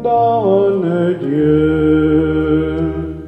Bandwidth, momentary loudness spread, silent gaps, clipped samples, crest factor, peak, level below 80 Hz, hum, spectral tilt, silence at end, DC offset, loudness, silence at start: 4 kHz; 4 LU; none; under 0.1%; 12 dB; -2 dBFS; -32 dBFS; none; -10 dB/octave; 0 s; under 0.1%; -14 LUFS; 0 s